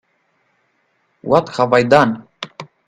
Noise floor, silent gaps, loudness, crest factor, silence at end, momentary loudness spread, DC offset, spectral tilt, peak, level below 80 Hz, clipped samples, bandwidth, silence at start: -64 dBFS; none; -14 LUFS; 18 dB; 0.25 s; 20 LU; under 0.1%; -6 dB/octave; 0 dBFS; -56 dBFS; under 0.1%; 11 kHz; 1.25 s